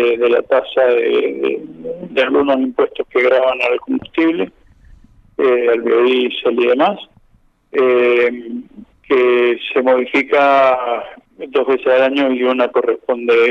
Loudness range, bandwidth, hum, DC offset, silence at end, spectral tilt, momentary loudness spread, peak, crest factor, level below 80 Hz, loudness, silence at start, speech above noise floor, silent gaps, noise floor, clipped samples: 2 LU; 6.2 kHz; none; under 0.1%; 0 s; -6 dB/octave; 10 LU; -2 dBFS; 14 dB; -54 dBFS; -15 LUFS; 0 s; 39 dB; none; -53 dBFS; under 0.1%